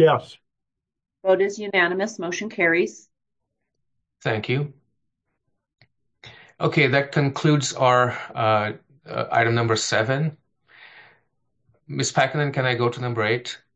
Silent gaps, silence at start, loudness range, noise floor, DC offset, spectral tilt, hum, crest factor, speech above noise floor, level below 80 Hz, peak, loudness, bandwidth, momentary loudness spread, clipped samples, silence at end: none; 0 s; 8 LU; -83 dBFS; under 0.1%; -5 dB/octave; none; 20 dB; 62 dB; -66 dBFS; -4 dBFS; -22 LUFS; 9.2 kHz; 10 LU; under 0.1%; 0.2 s